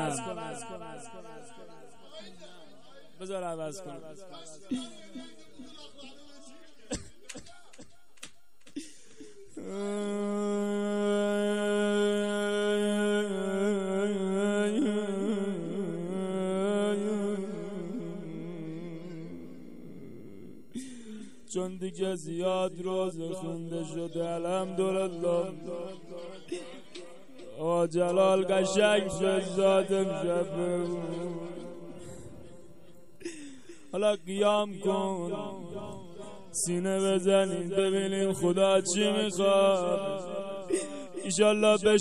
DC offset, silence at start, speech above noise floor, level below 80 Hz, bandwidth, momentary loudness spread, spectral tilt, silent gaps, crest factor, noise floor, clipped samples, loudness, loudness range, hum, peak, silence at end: 0.4%; 0 s; 31 dB; -66 dBFS; 13 kHz; 22 LU; -4.5 dB/octave; none; 20 dB; -60 dBFS; under 0.1%; -30 LUFS; 16 LU; none; -12 dBFS; 0 s